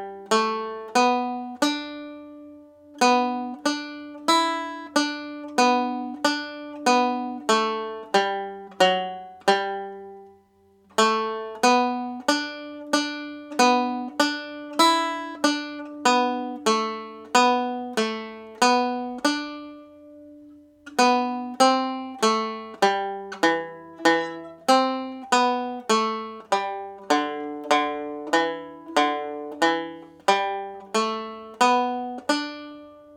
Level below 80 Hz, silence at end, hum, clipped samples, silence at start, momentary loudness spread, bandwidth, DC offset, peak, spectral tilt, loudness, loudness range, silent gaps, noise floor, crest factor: -76 dBFS; 0 s; none; under 0.1%; 0 s; 13 LU; 18 kHz; under 0.1%; -4 dBFS; -2.5 dB/octave; -24 LUFS; 2 LU; none; -59 dBFS; 22 dB